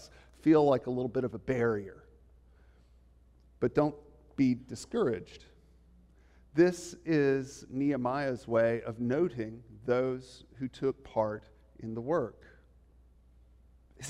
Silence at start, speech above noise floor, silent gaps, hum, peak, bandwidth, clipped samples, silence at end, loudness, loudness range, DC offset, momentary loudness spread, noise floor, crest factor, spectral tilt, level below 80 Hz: 0 s; 30 dB; none; none; -14 dBFS; 12.5 kHz; under 0.1%; 0 s; -31 LUFS; 5 LU; under 0.1%; 14 LU; -61 dBFS; 20 dB; -7 dB/octave; -60 dBFS